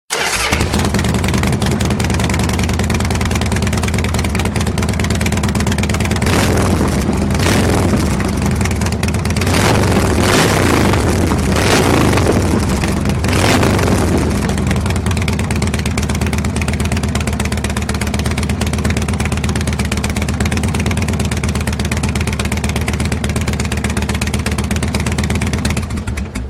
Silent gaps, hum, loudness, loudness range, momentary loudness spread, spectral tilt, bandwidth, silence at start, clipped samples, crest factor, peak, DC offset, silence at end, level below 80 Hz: none; none; -15 LUFS; 4 LU; 5 LU; -5 dB/octave; 16 kHz; 0.1 s; under 0.1%; 14 dB; 0 dBFS; under 0.1%; 0 s; -22 dBFS